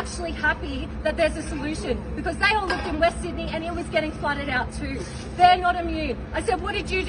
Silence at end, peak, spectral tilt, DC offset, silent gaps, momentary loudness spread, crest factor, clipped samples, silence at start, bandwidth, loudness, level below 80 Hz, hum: 0 s; -4 dBFS; -5 dB/octave; under 0.1%; none; 10 LU; 20 dB; under 0.1%; 0 s; 11 kHz; -24 LUFS; -36 dBFS; none